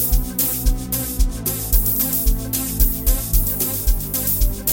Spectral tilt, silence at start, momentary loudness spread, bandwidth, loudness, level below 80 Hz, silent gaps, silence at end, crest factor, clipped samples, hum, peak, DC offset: -4 dB/octave; 0 s; 5 LU; 17 kHz; -19 LUFS; -20 dBFS; none; 0 s; 16 dB; under 0.1%; none; -2 dBFS; under 0.1%